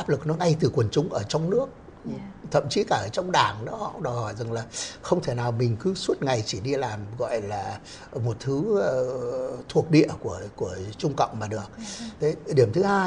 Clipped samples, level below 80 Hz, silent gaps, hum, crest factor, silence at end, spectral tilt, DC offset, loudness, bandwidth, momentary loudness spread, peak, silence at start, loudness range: under 0.1%; -54 dBFS; none; none; 22 dB; 0 s; -6 dB/octave; under 0.1%; -26 LUFS; 10.5 kHz; 12 LU; -4 dBFS; 0 s; 2 LU